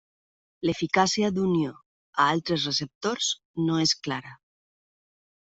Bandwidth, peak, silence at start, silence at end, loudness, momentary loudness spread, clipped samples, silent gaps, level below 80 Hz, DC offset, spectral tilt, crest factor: 8.2 kHz; -6 dBFS; 0.6 s; 1.2 s; -26 LUFS; 9 LU; under 0.1%; 1.86-2.13 s, 2.95-3.01 s, 3.45-3.54 s; -64 dBFS; under 0.1%; -4 dB/octave; 22 dB